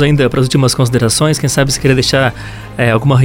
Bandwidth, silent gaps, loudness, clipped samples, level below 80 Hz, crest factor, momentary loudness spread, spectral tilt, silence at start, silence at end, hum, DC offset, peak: 17 kHz; none; -12 LUFS; under 0.1%; -32 dBFS; 12 dB; 5 LU; -5 dB/octave; 0 s; 0 s; none; under 0.1%; 0 dBFS